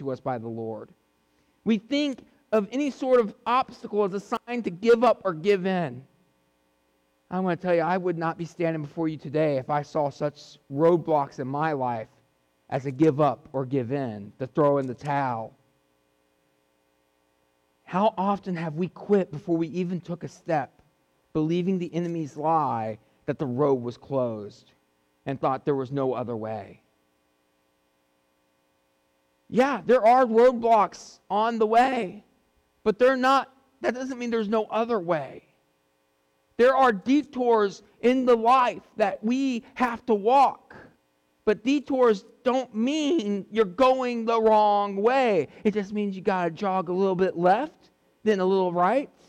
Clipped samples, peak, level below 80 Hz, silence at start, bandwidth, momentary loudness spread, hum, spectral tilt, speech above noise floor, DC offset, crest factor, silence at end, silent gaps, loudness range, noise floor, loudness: under 0.1%; -12 dBFS; -66 dBFS; 0 s; 10.5 kHz; 12 LU; none; -6.5 dB/octave; 45 dB; under 0.1%; 14 dB; 0.2 s; none; 7 LU; -69 dBFS; -25 LUFS